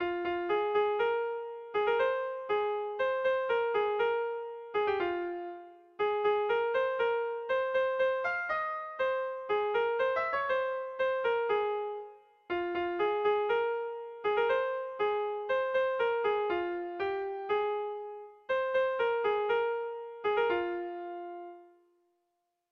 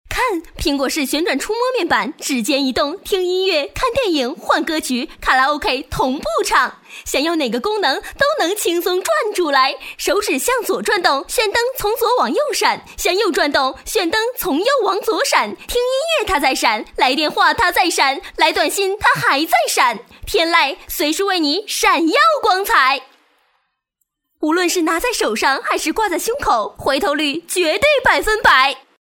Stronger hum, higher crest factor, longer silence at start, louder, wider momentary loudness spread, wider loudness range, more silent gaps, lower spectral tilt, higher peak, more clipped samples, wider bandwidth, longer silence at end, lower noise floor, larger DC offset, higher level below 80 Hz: neither; second, 12 dB vs 18 dB; about the same, 0 s vs 0.1 s; second, -31 LUFS vs -16 LUFS; first, 10 LU vs 6 LU; about the same, 2 LU vs 3 LU; neither; first, -5.5 dB/octave vs -2 dB/octave; second, -18 dBFS vs 0 dBFS; neither; second, 6.2 kHz vs 18 kHz; first, 1.05 s vs 0.2 s; first, -81 dBFS vs -73 dBFS; neither; second, -70 dBFS vs -42 dBFS